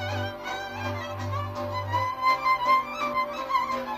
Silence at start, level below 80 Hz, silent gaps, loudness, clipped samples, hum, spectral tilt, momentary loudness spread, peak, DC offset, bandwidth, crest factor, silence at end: 0 s; -58 dBFS; none; -27 LUFS; under 0.1%; none; -5 dB/octave; 9 LU; -12 dBFS; under 0.1%; 15 kHz; 16 dB; 0 s